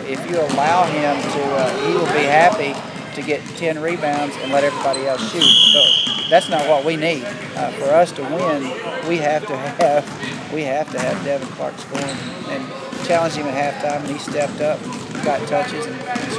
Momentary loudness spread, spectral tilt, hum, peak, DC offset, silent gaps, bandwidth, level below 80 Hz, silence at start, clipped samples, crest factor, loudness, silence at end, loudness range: 13 LU; -3.5 dB/octave; none; 0 dBFS; under 0.1%; none; 11 kHz; -62 dBFS; 0 s; under 0.1%; 18 dB; -18 LUFS; 0 s; 9 LU